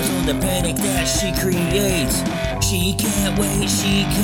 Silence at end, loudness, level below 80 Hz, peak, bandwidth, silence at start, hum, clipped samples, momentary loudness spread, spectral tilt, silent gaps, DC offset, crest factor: 0 s; -19 LUFS; -30 dBFS; -4 dBFS; 18.5 kHz; 0 s; none; under 0.1%; 2 LU; -4 dB/octave; none; under 0.1%; 14 dB